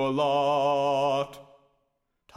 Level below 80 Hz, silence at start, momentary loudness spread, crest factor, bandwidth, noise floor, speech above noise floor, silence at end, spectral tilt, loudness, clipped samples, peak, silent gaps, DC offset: -66 dBFS; 0 s; 6 LU; 14 dB; 12.5 kHz; -76 dBFS; 51 dB; 0.95 s; -5.5 dB/octave; -25 LUFS; under 0.1%; -14 dBFS; none; under 0.1%